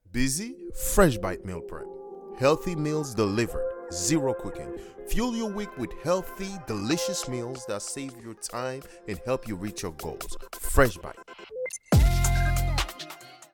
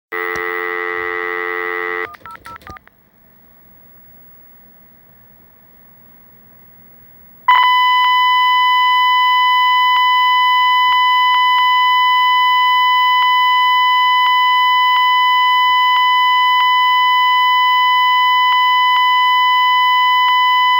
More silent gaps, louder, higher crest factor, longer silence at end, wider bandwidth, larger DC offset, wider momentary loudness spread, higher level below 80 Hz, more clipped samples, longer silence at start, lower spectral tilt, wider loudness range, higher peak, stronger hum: neither; second, -28 LUFS vs -12 LUFS; first, 24 dB vs 14 dB; about the same, 0.1 s vs 0 s; first, 19 kHz vs 16.5 kHz; neither; first, 16 LU vs 8 LU; first, -34 dBFS vs -60 dBFS; neither; about the same, 0.1 s vs 0.1 s; first, -5 dB/octave vs -0.5 dB/octave; second, 5 LU vs 11 LU; second, -4 dBFS vs 0 dBFS; neither